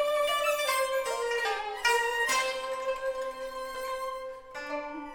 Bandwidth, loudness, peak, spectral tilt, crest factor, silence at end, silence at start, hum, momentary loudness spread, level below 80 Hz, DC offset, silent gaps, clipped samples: 19 kHz; -30 LUFS; -14 dBFS; 0 dB/octave; 18 dB; 0 s; 0 s; none; 11 LU; -60 dBFS; under 0.1%; none; under 0.1%